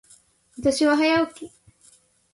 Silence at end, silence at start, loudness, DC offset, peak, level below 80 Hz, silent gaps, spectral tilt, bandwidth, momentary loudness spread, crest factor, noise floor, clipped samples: 0.85 s; 0.6 s; -21 LUFS; under 0.1%; -8 dBFS; -58 dBFS; none; -4 dB/octave; 11.5 kHz; 22 LU; 16 dB; -58 dBFS; under 0.1%